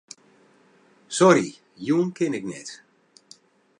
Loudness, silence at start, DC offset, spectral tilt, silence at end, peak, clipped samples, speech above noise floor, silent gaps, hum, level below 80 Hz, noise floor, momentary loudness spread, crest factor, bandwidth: -22 LUFS; 1.1 s; under 0.1%; -5 dB/octave; 1.05 s; -4 dBFS; under 0.1%; 36 dB; none; none; -74 dBFS; -58 dBFS; 18 LU; 22 dB; 11 kHz